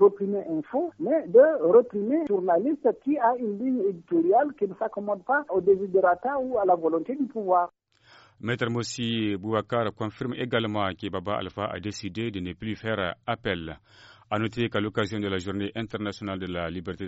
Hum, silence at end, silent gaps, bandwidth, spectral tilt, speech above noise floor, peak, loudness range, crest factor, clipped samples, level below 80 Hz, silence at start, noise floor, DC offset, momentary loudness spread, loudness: none; 0 s; none; 8 kHz; -4.5 dB/octave; 31 dB; -6 dBFS; 8 LU; 18 dB; under 0.1%; -60 dBFS; 0 s; -56 dBFS; under 0.1%; 11 LU; -26 LUFS